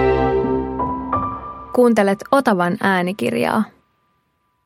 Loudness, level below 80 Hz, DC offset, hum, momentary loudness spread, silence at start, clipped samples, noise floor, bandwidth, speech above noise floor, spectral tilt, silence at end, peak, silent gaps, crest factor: -18 LUFS; -38 dBFS; under 0.1%; none; 8 LU; 0 s; under 0.1%; -66 dBFS; 16 kHz; 50 dB; -6.5 dB/octave; 0.95 s; -2 dBFS; none; 18 dB